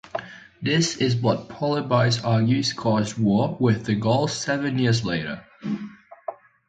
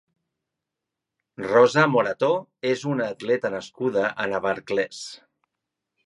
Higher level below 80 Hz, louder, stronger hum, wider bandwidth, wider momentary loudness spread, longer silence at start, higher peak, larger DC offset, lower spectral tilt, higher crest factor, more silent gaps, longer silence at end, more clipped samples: first, -56 dBFS vs -68 dBFS; about the same, -23 LUFS vs -23 LUFS; neither; second, 9.2 kHz vs 11 kHz; about the same, 13 LU vs 12 LU; second, 0.05 s vs 1.4 s; about the same, -6 dBFS vs -4 dBFS; neither; about the same, -5.5 dB/octave vs -5.5 dB/octave; about the same, 18 dB vs 22 dB; neither; second, 0.35 s vs 0.9 s; neither